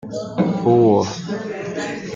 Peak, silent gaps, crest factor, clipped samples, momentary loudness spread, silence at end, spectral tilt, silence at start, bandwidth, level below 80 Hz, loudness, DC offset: -2 dBFS; none; 16 dB; under 0.1%; 13 LU; 0 s; -7 dB/octave; 0 s; 7.6 kHz; -56 dBFS; -19 LUFS; under 0.1%